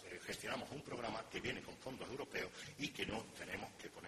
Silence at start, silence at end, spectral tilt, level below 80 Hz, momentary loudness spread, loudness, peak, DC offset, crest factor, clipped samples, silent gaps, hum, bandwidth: 0 s; 0 s; -3.5 dB/octave; -70 dBFS; 4 LU; -46 LUFS; -28 dBFS; under 0.1%; 18 dB; under 0.1%; none; none; 14.5 kHz